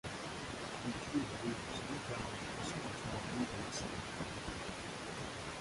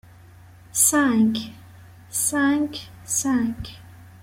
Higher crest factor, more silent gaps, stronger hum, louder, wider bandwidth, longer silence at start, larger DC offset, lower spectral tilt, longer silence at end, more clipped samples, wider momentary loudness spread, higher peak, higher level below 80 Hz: about the same, 16 dB vs 18 dB; neither; neither; second, -42 LUFS vs -21 LUFS; second, 11.5 kHz vs 16.5 kHz; second, 0.05 s vs 0.75 s; neither; about the same, -4 dB/octave vs -3 dB/octave; second, 0 s vs 0.15 s; neither; second, 4 LU vs 19 LU; second, -26 dBFS vs -6 dBFS; about the same, -58 dBFS vs -54 dBFS